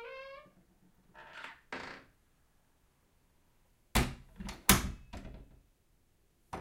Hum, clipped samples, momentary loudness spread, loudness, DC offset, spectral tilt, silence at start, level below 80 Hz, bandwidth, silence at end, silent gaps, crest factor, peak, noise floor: none; under 0.1%; 24 LU; -32 LUFS; under 0.1%; -3 dB/octave; 0 s; -48 dBFS; 16 kHz; 0 s; none; 34 dB; -6 dBFS; -71 dBFS